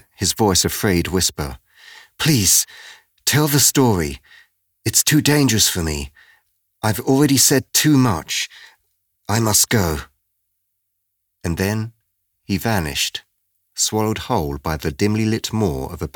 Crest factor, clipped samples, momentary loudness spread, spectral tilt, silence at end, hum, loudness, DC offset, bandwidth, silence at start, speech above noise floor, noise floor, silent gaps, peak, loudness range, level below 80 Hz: 16 dB; under 0.1%; 14 LU; -3.5 dB/octave; 0.1 s; none; -17 LUFS; under 0.1%; over 20 kHz; 0.2 s; 56 dB; -74 dBFS; none; -4 dBFS; 7 LU; -40 dBFS